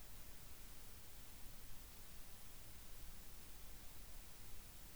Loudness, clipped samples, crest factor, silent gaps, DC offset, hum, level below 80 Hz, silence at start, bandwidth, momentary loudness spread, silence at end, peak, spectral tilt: -56 LUFS; under 0.1%; 14 dB; none; 0.2%; none; -60 dBFS; 0 s; over 20 kHz; 0 LU; 0 s; -40 dBFS; -2.5 dB/octave